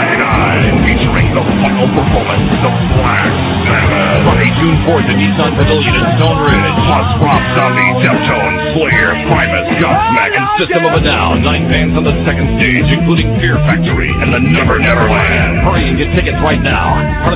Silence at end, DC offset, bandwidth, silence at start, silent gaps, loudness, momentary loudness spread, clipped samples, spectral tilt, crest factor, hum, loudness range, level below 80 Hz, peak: 0 s; under 0.1%; 4 kHz; 0 s; none; -10 LUFS; 3 LU; 0.2%; -10 dB/octave; 10 dB; none; 1 LU; -20 dBFS; 0 dBFS